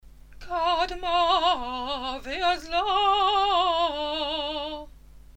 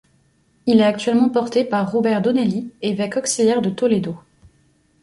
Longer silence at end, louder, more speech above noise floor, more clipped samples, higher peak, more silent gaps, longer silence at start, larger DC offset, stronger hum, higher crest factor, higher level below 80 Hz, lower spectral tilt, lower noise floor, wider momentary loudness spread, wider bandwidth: second, 0.15 s vs 0.85 s; second, -25 LUFS vs -19 LUFS; second, 23 dB vs 42 dB; neither; second, -10 dBFS vs -4 dBFS; neither; second, 0.05 s vs 0.65 s; neither; neither; about the same, 14 dB vs 16 dB; first, -46 dBFS vs -60 dBFS; second, -3 dB/octave vs -5 dB/octave; second, -47 dBFS vs -60 dBFS; about the same, 10 LU vs 9 LU; first, 15.5 kHz vs 11.5 kHz